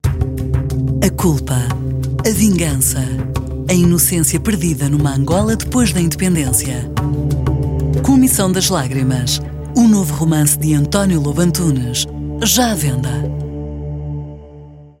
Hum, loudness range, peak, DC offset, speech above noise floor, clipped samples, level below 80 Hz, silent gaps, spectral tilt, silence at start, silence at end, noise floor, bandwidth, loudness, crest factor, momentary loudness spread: none; 2 LU; 0 dBFS; under 0.1%; 23 dB; under 0.1%; -28 dBFS; none; -5 dB/octave; 0.05 s; 0.1 s; -37 dBFS; 16.5 kHz; -15 LUFS; 16 dB; 9 LU